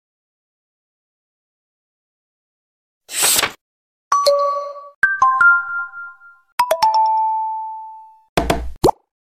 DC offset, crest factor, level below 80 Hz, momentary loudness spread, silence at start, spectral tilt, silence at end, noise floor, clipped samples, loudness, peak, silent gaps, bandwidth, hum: under 0.1%; 18 dB; -40 dBFS; 17 LU; 3.1 s; -2 dB/octave; 0.35 s; -40 dBFS; under 0.1%; -17 LUFS; -2 dBFS; 3.61-4.11 s, 4.95-5.02 s, 6.52-6.58 s, 8.29-8.36 s; 16.5 kHz; none